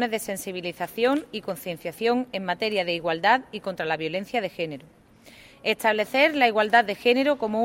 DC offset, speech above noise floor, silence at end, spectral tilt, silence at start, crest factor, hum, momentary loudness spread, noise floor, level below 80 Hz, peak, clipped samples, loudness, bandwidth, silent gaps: under 0.1%; 26 dB; 0 s; -4 dB/octave; 0 s; 20 dB; none; 12 LU; -51 dBFS; -64 dBFS; -4 dBFS; under 0.1%; -24 LUFS; 16.5 kHz; none